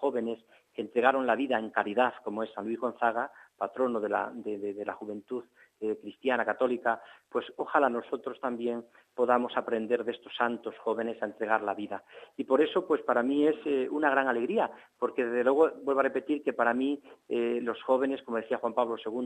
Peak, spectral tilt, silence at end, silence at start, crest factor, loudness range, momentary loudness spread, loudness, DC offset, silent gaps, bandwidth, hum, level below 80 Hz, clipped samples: -8 dBFS; -6 dB/octave; 0 s; 0 s; 22 dB; 5 LU; 11 LU; -30 LUFS; under 0.1%; none; 9.2 kHz; none; -80 dBFS; under 0.1%